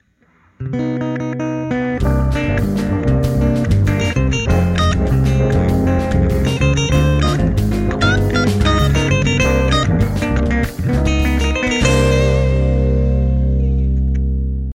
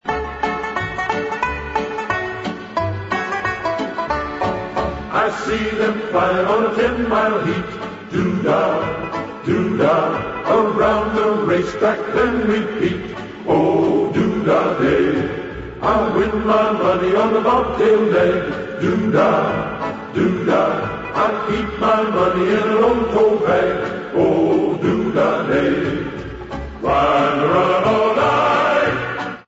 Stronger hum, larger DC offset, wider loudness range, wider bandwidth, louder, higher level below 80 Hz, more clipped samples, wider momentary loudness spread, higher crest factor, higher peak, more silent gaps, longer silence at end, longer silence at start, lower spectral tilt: neither; neither; second, 2 LU vs 5 LU; first, 15.5 kHz vs 8 kHz; about the same, -16 LUFS vs -18 LUFS; first, -20 dBFS vs -40 dBFS; neither; about the same, 6 LU vs 8 LU; about the same, 12 dB vs 14 dB; about the same, -2 dBFS vs -4 dBFS; neither; about the same, 0.05 s vs 0.05 s; first, 0.6 s vs 0.05 s; about the same, -6.5 dB/octave vs -6.5 dB/octave